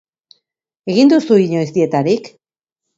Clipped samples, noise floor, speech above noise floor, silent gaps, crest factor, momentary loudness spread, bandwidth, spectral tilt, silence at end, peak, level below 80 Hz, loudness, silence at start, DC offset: under 0.1%; -83 dBFS; 70 dB; none; 16 dB; 8 LU; 7.8 kHz; -7 dB/octave; 0.7 s; 0 dBFS; -62 dBFS; -14 LUFS; 0.85 s; under 0.1%